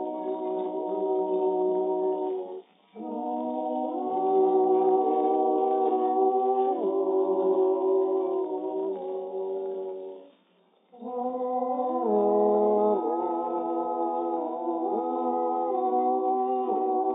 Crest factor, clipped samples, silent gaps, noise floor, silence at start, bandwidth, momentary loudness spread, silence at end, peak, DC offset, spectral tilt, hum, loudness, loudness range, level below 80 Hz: 14 dB; under 0.1%; none; -64 dBFS; 0 s; 3.8 kHz; 10 LU; 0 s; -12 dBFS; under 0.1%; -7.5 dB/octave; none; -27 LUFS; 6 LU; under -90 dBFS